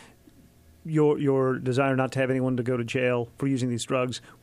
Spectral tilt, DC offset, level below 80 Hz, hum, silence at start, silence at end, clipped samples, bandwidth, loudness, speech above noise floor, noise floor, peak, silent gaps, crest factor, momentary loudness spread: -6.5 dB/octave; under 0.1%; -62 dBFS; none; 0 s; 0.15 s; under 0.1%; 13 kHz; -26 LUFS; 30 dB; -55 dBFS; -12 dBFS; none; 14 dB; 5 LU